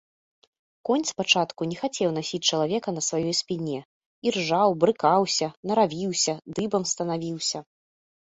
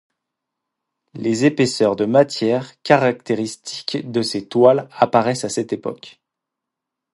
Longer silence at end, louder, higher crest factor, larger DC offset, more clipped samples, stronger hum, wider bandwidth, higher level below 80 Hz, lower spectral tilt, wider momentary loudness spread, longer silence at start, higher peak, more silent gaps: second, 0.7 s vs 1.05 s; second, -25 LUFS vs -18 LUFS; about the same, 22 dB vs 20 dB; neither; neither; neither; second, 8.4 kHz vs 11.5 kHz; about the same, -66 dBFS vs -64 dBFS; second, -3.5 dB/octave vs -5 dB/octave; second, 8 LU vs 11 LU; second, 0.85 s vs 1.15 s; second, -4 dBFS vs 0 dBFS; first, 3.85-4.22 s, 5.57-5.63 s vs none